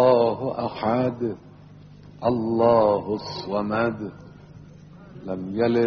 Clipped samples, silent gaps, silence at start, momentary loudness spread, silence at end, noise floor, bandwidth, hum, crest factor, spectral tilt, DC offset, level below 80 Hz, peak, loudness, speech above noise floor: under 0.1%; none; 0 s; 16 LU; 0 s; -46 dBFS; 6.6 kHz; none; 18 dB; -6 dB/octave; under 0.1%; -56 dBFS; -6 dBFS; -24 LUFS; 23 dB